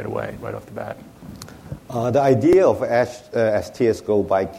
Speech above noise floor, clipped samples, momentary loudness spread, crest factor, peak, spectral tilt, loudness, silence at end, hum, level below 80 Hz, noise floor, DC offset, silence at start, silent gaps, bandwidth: 19 dB; under 0.1%; 23 LU; 16 dB; -4 dBFS; -7 dB/octave; -19 LUFS; 0 s; none; -50 dBFS; -39 dBFS; under 0.1%; 0 s; none; 15.5 kHz